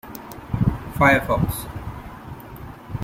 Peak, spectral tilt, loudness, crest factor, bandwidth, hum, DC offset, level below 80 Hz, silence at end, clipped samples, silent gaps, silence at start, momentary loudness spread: -2 dBFS; -6.5 dB/octave; -21 LUFS; 20 dB; 16.5 kHz; none; under 0.1%; -38 dBFS; 0 s; under 0.1%; none; 0.05 s; 21 LU